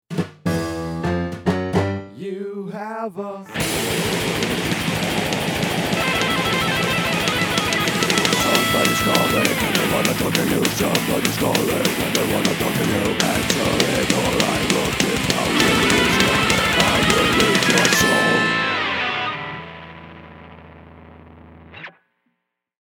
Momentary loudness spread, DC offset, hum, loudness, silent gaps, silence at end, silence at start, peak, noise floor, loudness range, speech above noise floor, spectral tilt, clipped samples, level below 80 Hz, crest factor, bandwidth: 13 LU; under 0.1%; none; -18 LUFS; none; 0.9 s; 0.1 s; 0 dBFS; -75 dBFS; 9 LU; 56 dB; -3.5 dB/octave; under 0.1%; -42 dBFS; 20 dB; over 20 kHz